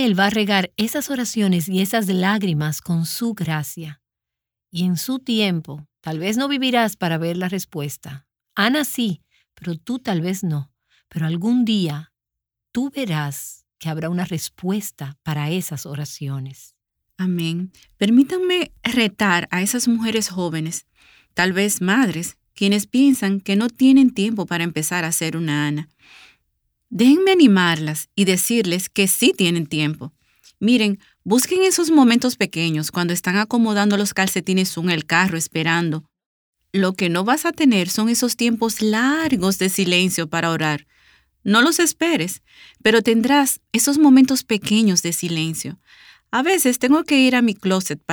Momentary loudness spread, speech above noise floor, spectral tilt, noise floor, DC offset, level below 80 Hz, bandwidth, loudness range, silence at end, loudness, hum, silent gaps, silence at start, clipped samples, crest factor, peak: 14 LU; 67 dB; -4 dB/octave; -86 dBFS; under 0.1%; -60 dBFS; over 20 kHz; 7 LU; 0 s; -19 LUFS; none; 36.26-36.53 s; 0 s; under 0.1%; 18 dB; -2 dBFS